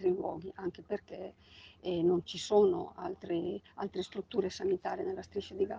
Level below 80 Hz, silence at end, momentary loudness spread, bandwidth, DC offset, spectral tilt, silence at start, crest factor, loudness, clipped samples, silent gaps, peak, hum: -68 dBFS; 0 s; 14 LU; 9.2 kHz; under 0.1%; -6 dB/octave; 0 s; 20 dB; -35 LUFS; under 0.1%; none; -16 dBFS; none